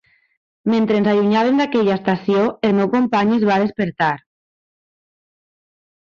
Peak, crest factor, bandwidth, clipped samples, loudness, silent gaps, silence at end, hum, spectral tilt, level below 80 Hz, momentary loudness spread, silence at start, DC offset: -4 dBFS; 14 dB; 7 kHz; under 0.1%; -17 LUFS; none; 1.85 s; none; -7.5 dB/octave; -58 dBFS; 5 LU; 0.65 s; under 0.1%